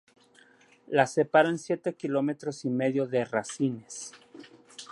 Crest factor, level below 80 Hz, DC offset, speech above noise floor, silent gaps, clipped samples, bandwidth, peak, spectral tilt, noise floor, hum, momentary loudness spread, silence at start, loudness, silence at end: 22 dB; -78 dBFS; under 0.1%; 32 dB; none; under 0.1%; 11.5 kHz; -8 dBFS; -5.5 dB/octave; -59 dBFS; none; 17 LU; 0.9 s; -28 LUFS; 0.05 s